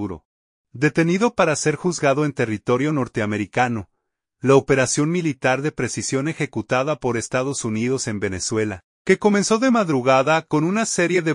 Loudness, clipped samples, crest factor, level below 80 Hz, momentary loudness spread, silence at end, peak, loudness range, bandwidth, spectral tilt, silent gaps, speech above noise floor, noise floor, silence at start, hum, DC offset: -20 LUFS; under 0.1%; 18 dB; -56 dBFS; 7 LU; 0 s; -4 dBFS; 3 LU; 11 kHz; -5 dB/octave; 0.25-0.64 s, 8.84-9.05 s; 56 dB; -76 dBFS; 0 s; none; under 0.1%